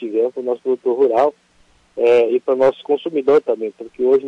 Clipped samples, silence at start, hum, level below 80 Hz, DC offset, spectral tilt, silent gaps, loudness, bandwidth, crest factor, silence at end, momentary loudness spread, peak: under 0.1%; 0 s; none; -64 dBFS; under 0.1%; -6.5 dB/octave; none; -17 LUFS; 7.6 kHz; 12 dB; 0 s; 8 LU; -6 dBFS